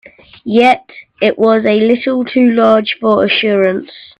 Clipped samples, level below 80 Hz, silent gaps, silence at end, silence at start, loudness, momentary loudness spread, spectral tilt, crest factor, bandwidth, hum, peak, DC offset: under 0.1%; -56 dBFS; none; 0.2 s; 0.45 s; -12 LUFS; 6 LU; -6.5 dB/octave; 12 dB; 8.4 kHz; none; 0 dBFS; under 0.1%